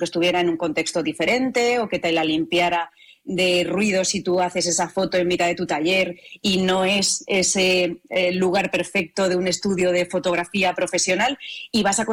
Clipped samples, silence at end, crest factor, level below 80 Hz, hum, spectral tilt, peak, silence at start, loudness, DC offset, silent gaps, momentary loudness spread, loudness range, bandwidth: under 0.1%; 0 s; 10 dB; -56 dBFS; none; -3 dB/octave; -12 dBFS; 0 s; -21 LUFS; under 0.1%; none; 4 LU; 1 LU; 17 kHz